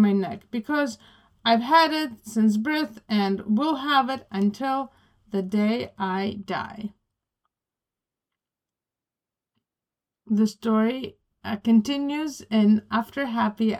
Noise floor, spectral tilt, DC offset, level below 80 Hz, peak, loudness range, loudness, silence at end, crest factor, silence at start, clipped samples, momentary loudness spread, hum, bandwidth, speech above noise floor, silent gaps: -90 dBFS; -6 dB/octave; under 0.1%; -66 dBFS; -6 dBFS; 10 LU; -24 LUFS; 0 s; 18 dB; 0 s; under 0.1%; 11 LU; none; 14 kHz; 66 dB; none